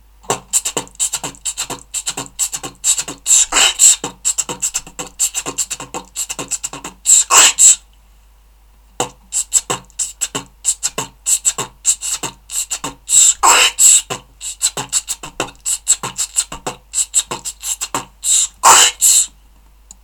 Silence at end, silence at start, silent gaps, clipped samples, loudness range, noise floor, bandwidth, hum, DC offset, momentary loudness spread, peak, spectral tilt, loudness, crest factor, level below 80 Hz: 0.75 s; 0.3 s; none; under 0.1%; 7 LU; -47 dBFS; over 20 kHz; none; under 0.1%; 16 LU; 0 dBFS; 1 dB/octave; -13 LUFS; 16 dB; -46 dBFS